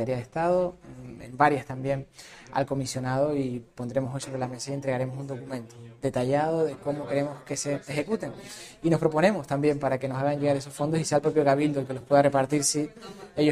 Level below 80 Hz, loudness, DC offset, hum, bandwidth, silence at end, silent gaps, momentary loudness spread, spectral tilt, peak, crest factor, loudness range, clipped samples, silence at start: -58 dBFS; -27 LUFS; under 0.1%; none; 14.5 kHz; 0 s; none; 14 LU; -5.5 dB/octave; -6 dBFS; 20 dB; 5 LU; under 0.1%; 0 s